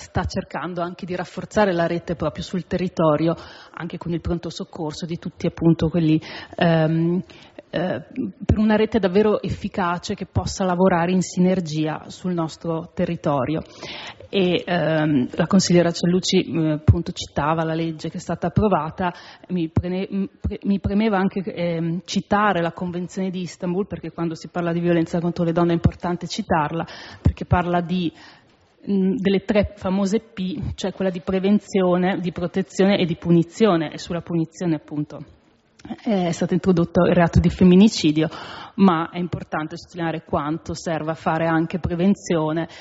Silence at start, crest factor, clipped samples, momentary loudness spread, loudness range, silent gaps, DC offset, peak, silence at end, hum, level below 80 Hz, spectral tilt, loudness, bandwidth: 0 s; 18 dB; under 0.1%; 11 LU; 5 LU; none; under 0.1%; -2 dBFS; 0 s; none; -40 dBFS; -6 dB/octave; -22 LUFS; 8 kHz